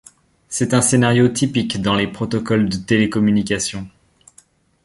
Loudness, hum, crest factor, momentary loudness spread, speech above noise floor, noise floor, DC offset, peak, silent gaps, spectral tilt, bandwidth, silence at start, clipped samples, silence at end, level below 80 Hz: -17 LUFS; none; 16 dB; 10 LU; 36 dB; -53 dBFS; under 0.1%; -2 dBFS; none; -5 dB/octave; 11.5 kHz; 0.5 s; under 0.1%; 0.95 s; -46 dBFS